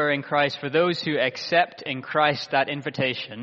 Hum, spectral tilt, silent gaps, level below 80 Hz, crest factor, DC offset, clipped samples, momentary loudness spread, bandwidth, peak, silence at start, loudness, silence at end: none; -2.5 dB/octave; none; -68 dBFS; 20 dB; under 0.1%; under 0.1%; 5 LU; 7.6 kHz; -4 dBFS; 0 s; -24 LUFS; 0 s